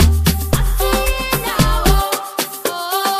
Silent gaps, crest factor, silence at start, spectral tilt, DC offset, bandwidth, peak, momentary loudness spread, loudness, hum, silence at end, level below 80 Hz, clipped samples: none; 16 dB; 0 s; -4.5 dB/octave; under 0.1%; 15.5 kHz; 0 dBFS; 6 LU; -17 LUFS; none; 0 s; -20 dBFS; under 0.1%